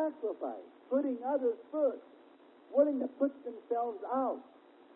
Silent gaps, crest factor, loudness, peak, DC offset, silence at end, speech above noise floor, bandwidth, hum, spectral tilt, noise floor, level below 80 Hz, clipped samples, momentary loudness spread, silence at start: none; 18 dB; -34 LUFS; -16 dBFS; under 0.1%; 0.5 s; 26 dB; 4.1 kHz; none; -9 dB/octave; -59 dBFS; -88 dBFS; under 0.1%; 12 LU; 0 s